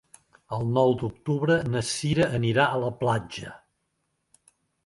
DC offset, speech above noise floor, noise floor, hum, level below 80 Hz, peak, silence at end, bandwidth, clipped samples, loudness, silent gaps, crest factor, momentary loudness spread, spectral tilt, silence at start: under 0.1%; 51 dB; -76 dBFS; none; -56 dBFS; -6 dBFS; 1.3 s; 11.5 kHz; under 0.1%; -25 LUFS; none; 20 dB; 12 LU; -5.5 dB/octave; 0.5 s